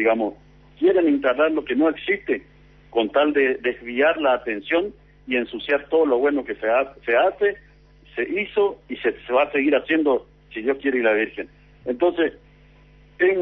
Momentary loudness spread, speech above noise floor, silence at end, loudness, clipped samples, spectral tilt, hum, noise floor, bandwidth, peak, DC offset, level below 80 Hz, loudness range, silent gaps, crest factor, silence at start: 9 LU; 30 dB; 0 s; -22 LUFS; under 0.1%; -7.5 dB/octave; 50 Hz at -55 dBFS; -51 dBFS; 5.2 kHz; -8 dBFS; under 0.1%; -54 dBFS; 2 LU; none; 14 dB; 0 s